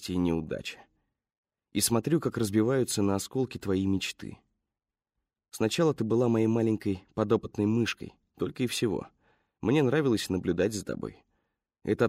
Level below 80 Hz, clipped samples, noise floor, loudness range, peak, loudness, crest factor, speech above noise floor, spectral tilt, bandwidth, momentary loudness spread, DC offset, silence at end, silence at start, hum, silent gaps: -60 dBFS; under 0.1%; under -90 dBFS; 2 LU; -10 dBFS; -29 LUFS; 18 dB; over 62 dB; -5.5 dB/octave; 16 kHz; 12 LU; under 0.1%; 0 s; 0 s; none; 1.38-1.43 s